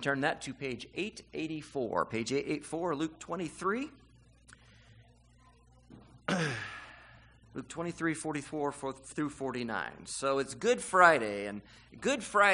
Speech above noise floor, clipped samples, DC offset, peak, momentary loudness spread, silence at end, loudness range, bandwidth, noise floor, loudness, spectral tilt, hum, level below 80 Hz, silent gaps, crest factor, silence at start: 29 dB; under 0.1%; under 0.1%; -8 dBFS; 13 LU; 0 s; 11 LU; 10.5 kHz; -62 dBFS; -33 LUFS; -4 dB/octave; 60 Hz at -65 dBFS; -64 dBFS; none; 26 dB; 0 s